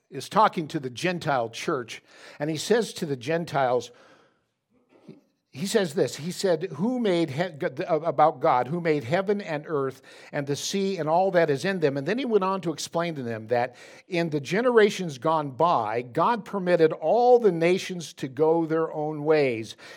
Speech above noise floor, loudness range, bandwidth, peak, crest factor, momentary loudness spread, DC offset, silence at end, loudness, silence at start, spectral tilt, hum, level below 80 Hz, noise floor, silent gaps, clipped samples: 44 dB; 6 LU; 17 kHz; -6 dBFS; 20 dB; 10 LU; under 0.1%; 0 s; -25 LUFS; 0.1 s; -5.5 dB/octave; none; -78 dBFS; -69 dBFS; none; under 0.1%